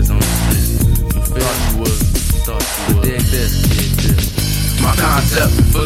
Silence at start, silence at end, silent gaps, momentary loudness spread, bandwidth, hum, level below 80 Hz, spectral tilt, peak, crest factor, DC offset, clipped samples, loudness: 0 s; 0 s; none; 4 LU; 16.5 kHz; none; -18 dBFS; -4.5 dB/octave; 0 dBFS; 12 dB; under 0.1%; under 0.1%; -15 LUFS